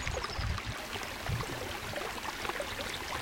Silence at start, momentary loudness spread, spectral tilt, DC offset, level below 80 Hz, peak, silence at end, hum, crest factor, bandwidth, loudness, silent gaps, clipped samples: 0 s; 2 LU; -3.5 dB/octave; under 0.1%; -46 dBFS; -18 dBFS; 0 s; none; 20 dB; 17 kHz; -37 LUFS; none; under 0.1%